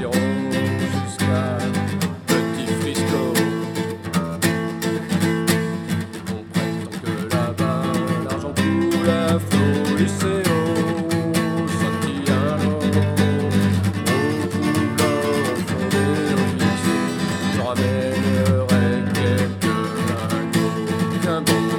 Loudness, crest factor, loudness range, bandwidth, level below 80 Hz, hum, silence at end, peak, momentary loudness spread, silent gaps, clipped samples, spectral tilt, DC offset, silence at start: -21 LUFS; 18 dB; 3 LU; 19 kHz; -56 dBFS; none; 0 s; -2 dBFS; 5 LU; none; under 0.1%; -5.5 dB/octave; under 0.1%; 0 s